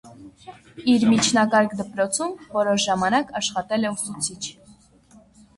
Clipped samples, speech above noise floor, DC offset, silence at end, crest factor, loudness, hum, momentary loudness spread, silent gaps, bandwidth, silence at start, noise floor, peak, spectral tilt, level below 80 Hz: under 0.1%; 31 dB; under 0.1%; 1.05 s; 18 dB; -22 LUFS; none; 10 LU; none; 11.5 kHz; 0.05 s; -53 dBFS; -6 dBFS; -3.5 dB/octave; -58 dBFS